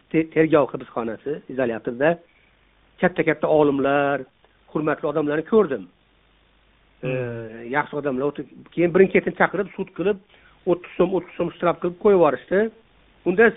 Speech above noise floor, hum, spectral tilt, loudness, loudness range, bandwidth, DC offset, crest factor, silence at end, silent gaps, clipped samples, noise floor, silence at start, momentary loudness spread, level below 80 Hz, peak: 38 dB; none; -5.5 dB/octave; -22 LUFS; 4 LU; 4 kHz; under 0.1%; 20 dB; 0 s; none; under 0.1%; -59 dBFS; 0.15 s; 12 LU; -56 dBFS; -2 dBFS